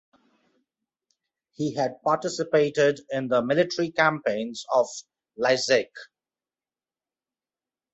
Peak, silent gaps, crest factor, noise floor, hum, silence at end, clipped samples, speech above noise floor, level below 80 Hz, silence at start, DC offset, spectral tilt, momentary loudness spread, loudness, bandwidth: -6 dBFS; none; 22 dB; under -90 dBFS; none; 1.9 s; under 0.1%; over 66 dB; -72 dBFS; 1.6 s; under 0.1%; -4.5 dB/octave; 9 LU; -24 LUFS; 8.2 kHz